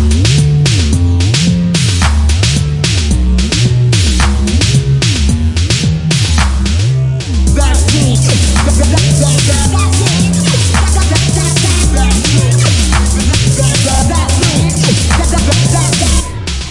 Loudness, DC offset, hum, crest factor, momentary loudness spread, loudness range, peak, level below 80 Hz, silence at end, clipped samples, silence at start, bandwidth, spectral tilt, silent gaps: -10 LUFS; under 0.1%; none; 10 dB; 3 LU; 1 LU; 0 dBFS; -16 dBFS; 0 s; under 0.1%; 0 s; 11.5 kHz; -4.5 dB/octave; none